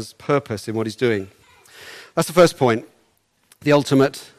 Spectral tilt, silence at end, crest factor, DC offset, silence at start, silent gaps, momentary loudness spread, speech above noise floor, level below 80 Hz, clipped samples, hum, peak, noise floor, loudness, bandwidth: -5.5 dB/octave; 0.15 s; 18 dB; under 0.1%; 0 s; none; 12 LU; 44 dB; -58 dBFS; under 0.1%; none; -4 dBFS; -63 dBFS; -19 LUFS; 15 kHz